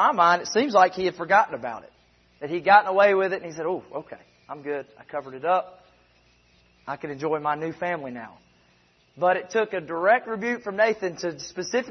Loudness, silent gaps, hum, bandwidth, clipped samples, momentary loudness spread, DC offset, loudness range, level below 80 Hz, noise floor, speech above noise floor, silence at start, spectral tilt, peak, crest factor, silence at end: -24 LUFS; none; none; 6.4 kHz; under 0.1%; 18 LU; under 0.1%; 11 LU; -68 dBFS; -61 dBFS; 38 dB; 0 s; -4 dB/octave; -4 dBFS; 22 dB; 0 s